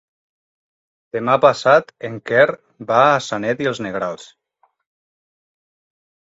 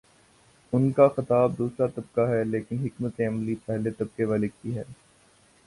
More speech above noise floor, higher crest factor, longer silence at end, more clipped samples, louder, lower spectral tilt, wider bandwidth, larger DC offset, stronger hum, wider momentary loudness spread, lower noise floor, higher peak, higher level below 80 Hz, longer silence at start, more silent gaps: first, over 73 dB vs 34 dB; about the same, 20 dB vs 20 dB; first, 2.15 s vs 0.7 s; neither; first, -17 LUFS vs -26 LUFS; second, -5 dB/octave vs -9 dB/octave; second, 8 kHz vs 11.5 kHz; neither; neither; first, 15 LU vs 11 LU; first, under -90 dBFS vs -60 dBFS; first, 0 dBFS vs -6 dBFS; about the same, -64 dBFS vs -60 dBFS; first, 1.15 s vs 0.7 s; neither